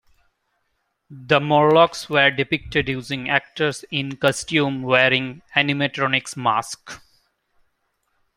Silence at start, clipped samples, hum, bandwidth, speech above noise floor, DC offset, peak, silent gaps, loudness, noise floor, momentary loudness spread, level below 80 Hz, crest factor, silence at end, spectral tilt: 1.1 s; under 0.1%; none; 16 kHz; 52 dB; under 0.1%; 0 dBFS; none; -19 LUFS; -72 dBFS; 10 LU; -54 dBFS; 20 dB; 1.4 s; -4.5 dB/octave